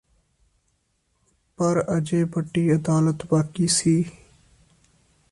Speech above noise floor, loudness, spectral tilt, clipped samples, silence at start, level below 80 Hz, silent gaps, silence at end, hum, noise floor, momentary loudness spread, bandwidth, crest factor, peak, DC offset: 49 dB; -22 LUFS; -5.5 dB/octave; under 0.1%; 1.6 s; -56 dBFS; none; 1.2 s; none; -70 dBFS; 4 LU; 11.5 kHz; 16 dB; -8 dBFS; under 0.1%